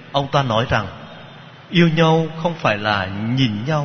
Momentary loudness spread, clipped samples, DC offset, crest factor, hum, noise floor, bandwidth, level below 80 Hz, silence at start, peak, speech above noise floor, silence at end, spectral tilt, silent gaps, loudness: 15 LU; under 0.1%; under 0.1%; 18 dB; none; -40 dBFS; 6.6 kHz; -48 dBFS; 0 s; -2 dBFS; 22 dB; 0 s; -6.5 dB/octave; none; -18 LUFS